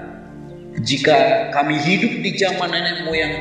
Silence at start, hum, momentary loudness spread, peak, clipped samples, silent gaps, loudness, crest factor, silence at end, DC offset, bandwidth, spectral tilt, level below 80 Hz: 0 s; none; 21 LU; 0 dBFS; under 0.1%; none; -17 LUFS; 18 dB; 0 s; under 0.1%; 10 kHz; -4.5 dB/octave; -50 dBFS